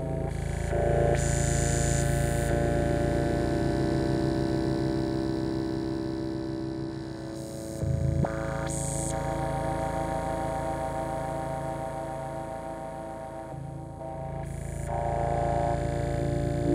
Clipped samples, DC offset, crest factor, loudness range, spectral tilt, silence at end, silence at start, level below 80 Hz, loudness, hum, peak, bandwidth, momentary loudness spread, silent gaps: under 0.1%; under 0.1%; 16 dB; 8 LU; -6 dB/octave; 0 s; 0 s; -38 dBFS; -30 LUFS; none; -12 dBFS; 16 kHz; 11 LU; none